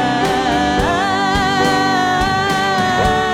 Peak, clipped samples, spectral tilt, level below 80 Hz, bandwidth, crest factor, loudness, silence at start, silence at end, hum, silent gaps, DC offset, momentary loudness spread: -2 dBFS; under 0.1%; -4.5 dB/octave; -32 dBFS; 16.5 kHz; 14 dB; -15 LUFS; 0 s; 0 s; none; none; under 0.1%; 1 LU